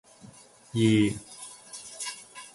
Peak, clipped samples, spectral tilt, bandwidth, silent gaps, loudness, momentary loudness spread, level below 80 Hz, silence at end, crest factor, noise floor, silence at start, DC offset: -10 dBFS; under 0.1%; -5.5 dB/octave; 11.5 kHz; none; -27 LUFS; 20 LU; -60 dBFS; 0.05 s; 20 dB; -52 dBFS; 0.25 s; under 0.1%